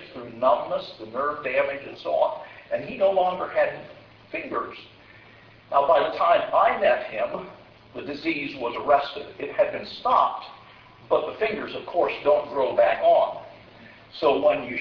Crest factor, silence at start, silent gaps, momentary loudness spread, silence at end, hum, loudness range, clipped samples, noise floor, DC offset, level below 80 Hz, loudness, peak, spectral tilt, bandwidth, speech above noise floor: 18 dB; 0 s; none; 15 LU; 0 s; none; 3 LU; under 0.1%; -50 dBFS; under 0.1%; -62 dBFS; -24 LUFS; -6 dBFS; -6.5 dB/octave; 5.4 kHz; 27 dB